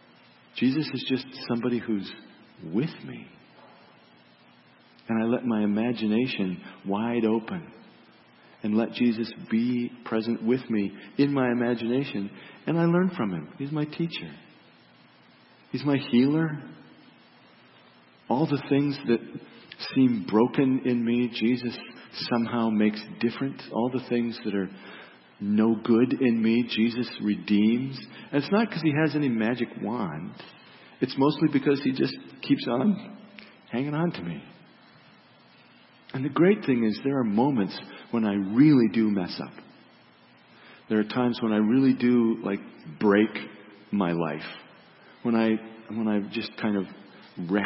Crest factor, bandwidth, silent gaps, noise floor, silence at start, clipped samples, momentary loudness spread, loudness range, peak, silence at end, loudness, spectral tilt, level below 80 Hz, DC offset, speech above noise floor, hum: 20 dB; 5.8 kHz; none; -56 dBFS; 0.55 s; under 0.1%; 15 LU; 5 LU; -8 dBFS; 0 s; -26 LUFS; -11 dB/octave; -70 dBFS; under 0.1%; 31 dB; none